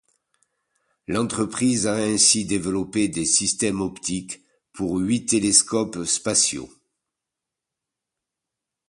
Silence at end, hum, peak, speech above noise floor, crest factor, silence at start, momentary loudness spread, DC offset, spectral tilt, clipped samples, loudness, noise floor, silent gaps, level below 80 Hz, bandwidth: 2.25 s; none; -2 dBFS; 63 dB; 24 dB; 1.1 s; 13 LU; under 0.1%; -3 dB/octave; under 0.1%; -21 LUFS; -85 dBFS; none; -54 dBFS; 11.5 kHz